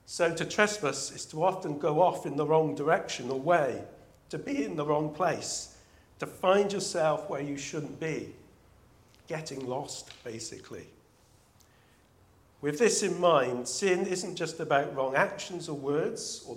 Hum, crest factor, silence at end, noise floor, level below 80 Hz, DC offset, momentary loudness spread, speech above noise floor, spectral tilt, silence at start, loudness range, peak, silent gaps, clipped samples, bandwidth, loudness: none; 24 dB; 0 s; -62 dBFS; -68 dBFS; under 0.1%; 14 LU; 33 dB; -4 dB/octave; 0.1 s; 13 LU; -6 dBFS; none; under 0.1%; 16 kHz; -30 LUFS